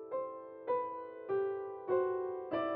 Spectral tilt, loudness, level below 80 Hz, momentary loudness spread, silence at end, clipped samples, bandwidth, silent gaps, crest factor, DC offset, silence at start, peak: -4.5 dB/octave; -38 LUFS; -80 dBFS; 10 LU; 0 s; under 0.1%; 4.3 kHz; none; 16 dB; under 0.1%; 0 s; -22 dBFS